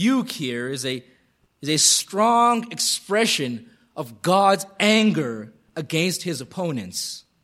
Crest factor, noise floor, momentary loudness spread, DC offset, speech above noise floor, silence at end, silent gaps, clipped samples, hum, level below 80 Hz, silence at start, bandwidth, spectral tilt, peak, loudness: 20 dB; -63 dBFS; 17 LU; under 0.1%; 41 dB; 0.25 s; none; under 0.1%; none; -70 dBFS; 0 s; 16 kHz; -3 dB/octave; -4 dBFS; -21 LUFS